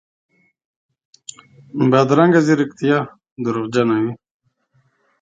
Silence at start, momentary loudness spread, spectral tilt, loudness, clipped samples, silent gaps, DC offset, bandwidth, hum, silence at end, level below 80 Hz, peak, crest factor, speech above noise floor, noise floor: 1.75 s; 24 LU; -7 dB/octave; -17 LUFS; under 0.1%; 3.32-3.36 s; under 0.1%; 9.2 kHz; none; 1.05 s; -62 dBFS; 0 dBFS; 18 dB; 47 dB; -62 dBFS